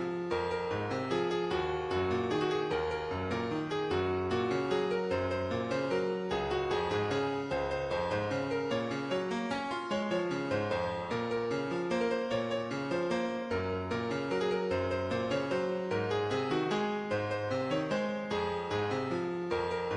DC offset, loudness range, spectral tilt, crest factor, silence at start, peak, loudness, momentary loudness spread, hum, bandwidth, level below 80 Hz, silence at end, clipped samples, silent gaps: under 0.1%; 1 LU; -6 dB/octave; 14 dB; 0 s; -18 dBFS; -33 LUFS; 3 LU; none; 11 kHz; -58 dBFS; 0 s; under 0.1%; none